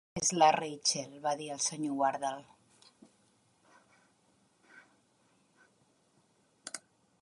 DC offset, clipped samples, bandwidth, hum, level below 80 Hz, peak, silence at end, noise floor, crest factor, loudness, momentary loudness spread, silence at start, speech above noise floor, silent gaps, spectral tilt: under 0.1%; under 0.1%; 11.5 kHz; none; -74 dBFS; -12 dBFS; 0.45 s; -71 dBFS; 24 dB; -32 LUFS; 19 LU; 0.15 s; 39 dB; none; -2.5 dB/octave